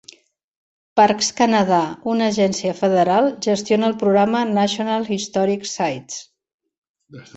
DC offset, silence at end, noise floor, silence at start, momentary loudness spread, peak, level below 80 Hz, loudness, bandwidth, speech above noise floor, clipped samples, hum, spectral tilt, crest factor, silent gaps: under 0.1%; 0.15 s; -48 dBFS; 0.95 s; 7 LU; -2 dBFS; -62 dBFS; -18 LUFS; 8.2 kHz; 30 dB; under 0.1%; none; -4.5 dB/octave; 18 dB; 6.54-6.59 s, 6.78-6.82 s, 6.89-6.95 s